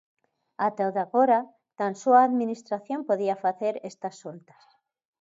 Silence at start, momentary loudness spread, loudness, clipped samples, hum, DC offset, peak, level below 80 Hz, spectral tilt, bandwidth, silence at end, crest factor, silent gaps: 0.6 s; 17 LU; -25 LUFS; under 0.1%; none; under 0.1%; -8 dBFS; -82 dBFS; -6.5 dB/octave; 7.8 kHz; 0.8 s; 18 dB; none